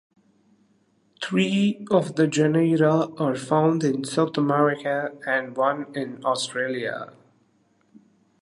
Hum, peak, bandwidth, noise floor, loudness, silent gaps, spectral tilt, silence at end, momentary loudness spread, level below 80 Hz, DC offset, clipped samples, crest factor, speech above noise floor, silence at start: none; -6 dBFS; 11.5 kHz; -64 dBFS; -23 LUFS; none; -6 dB/octave; 1.3 s; 9 LU; -72 dBFS; under 0.1%; under 0.1%; 18 dB; 42 dB; 1.2 s